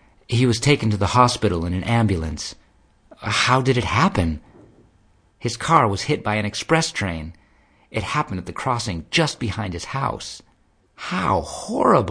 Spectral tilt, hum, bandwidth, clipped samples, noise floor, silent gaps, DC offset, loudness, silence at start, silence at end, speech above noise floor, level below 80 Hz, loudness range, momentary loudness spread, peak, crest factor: -5 dB/octave; none; 10.5 kHz; under 0.1%; -60 dBFS; none; under 0.1%; -21 LUFS; 0.3 s; 0 s; 39 dB; -42 dBFS; 4 LU; 13 LU; 0 dBFS; 22 dB